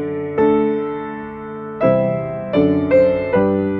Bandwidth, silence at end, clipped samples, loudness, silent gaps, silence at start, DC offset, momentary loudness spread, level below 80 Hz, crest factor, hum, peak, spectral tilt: 4.5 kHz; 0 s; under 0.1%; -17 LUFS; none; 0 s; under 0.1%; 15 LU; -48 dBFS; 14 dB; none; -2 dBFS; -10 dB/octave